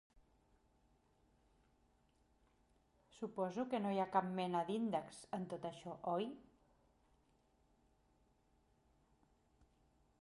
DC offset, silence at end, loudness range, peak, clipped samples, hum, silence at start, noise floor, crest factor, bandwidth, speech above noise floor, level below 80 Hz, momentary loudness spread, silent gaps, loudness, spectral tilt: under 0.1%; 3.8 s; 9 LU; -22 dBFS; under 0.1%; none; 3.15 s; -76 dBFS; 24 dB; 11.5 kHz; 35 dB; -78 dBFS; 10 LU; none; -42 LUFS; -6.5 dB/octave